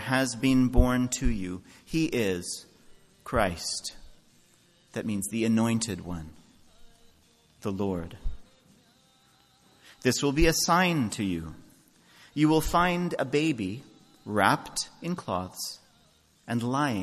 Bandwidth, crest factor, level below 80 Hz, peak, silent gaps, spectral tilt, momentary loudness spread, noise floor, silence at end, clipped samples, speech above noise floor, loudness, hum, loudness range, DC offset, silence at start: 14 kHz; 24 dB; -40 dBFS; -6 dBFS; none; -4.5 dB/octave; 16 LU; -63 dBFS; 0 s; under 0.1%; 36 dB; -28 LUFS; none; 9 LU; under 0.1%; 0 s